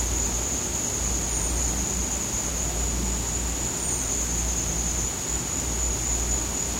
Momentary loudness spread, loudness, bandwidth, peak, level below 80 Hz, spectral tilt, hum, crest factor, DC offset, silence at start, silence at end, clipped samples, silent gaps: 2 LU; -25 LUFS; 16 kHz; -12 dBFS; -32 dBFS; -2.5 dB/octave; none; 14 dB; under 0.1%; 0 s; 0 s; under 0.1%; none